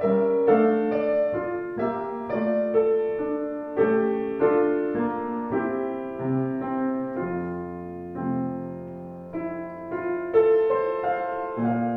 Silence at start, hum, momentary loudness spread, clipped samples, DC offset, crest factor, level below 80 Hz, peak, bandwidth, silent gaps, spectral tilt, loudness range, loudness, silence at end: 0 s; none; 13 LU; under 0.1%; under 0.1%; 16 dB; -60 dBFS; -8 dBFS; 4.3 kHz; none; -10.5 dB/octave; 6 LU; -25 LUFS; 0 s